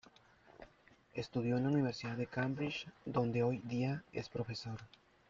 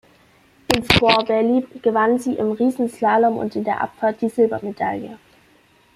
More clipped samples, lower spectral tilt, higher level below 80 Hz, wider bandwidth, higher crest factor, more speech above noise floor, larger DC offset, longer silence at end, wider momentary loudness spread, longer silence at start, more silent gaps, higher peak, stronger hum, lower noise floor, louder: neither; first, -7 dB/octave vs -5 dB/octave; second, -70 dBFS vs -46 dBFS; second, 7.6 kHz vs 16 kHz; about the same, 18 dB vs 20 dB; second, 29 dB vs 36 dB; neither; second, 0.45 s vs 0.8 s; first, 14 LU vs 9 LU; about the same, 0.6 s vs 0.7 s; neither; second, -22 dBFS vs 0 dBFS; neither; first, -67 dBFS vs -55 dBFS; second, -39 LUFS vs -19 LUFS